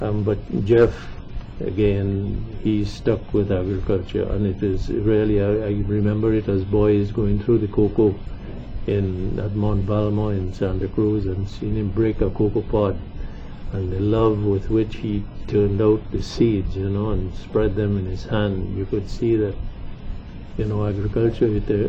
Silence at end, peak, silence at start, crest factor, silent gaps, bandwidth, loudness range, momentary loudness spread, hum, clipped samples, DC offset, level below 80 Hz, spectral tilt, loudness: 0 s; -6 dBFS; 0 s; 16 dB; none; 7.4 kHz; 3 LU; 13 LU; none; under 0.1%; under 0.1%; -32 dBFS; -9 dB/octave; -22 LUFS